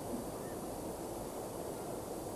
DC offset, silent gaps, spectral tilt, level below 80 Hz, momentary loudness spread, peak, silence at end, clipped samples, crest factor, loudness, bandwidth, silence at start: under 0.1%; none; -5 dB/octave; -58 dBFS; 1 LU; -28 dBFS; 0 s; under 0.1%; 14 dB; -43 LUFS; 16.5 kHz; 0 s